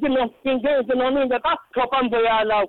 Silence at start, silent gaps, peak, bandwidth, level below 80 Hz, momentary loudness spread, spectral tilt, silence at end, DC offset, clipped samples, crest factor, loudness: 0 s; none; -14 dBFS; 4.3 kHz; -50 dBFS; 4 LU; -7 dB/octave; 0 s; under 0.1%; under 0.1%; 8 dB; -21 LUFS